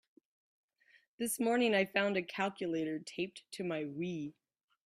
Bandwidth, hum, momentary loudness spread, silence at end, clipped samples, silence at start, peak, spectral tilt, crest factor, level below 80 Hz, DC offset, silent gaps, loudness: 15.5 kHz; none; 11 LU; 0.55 s; under 0.1%; 1.2 s; -16 dBFS; -4 dB/octave; 20 dB; -80 dBFS; under 0.1%; none; -35 LUFS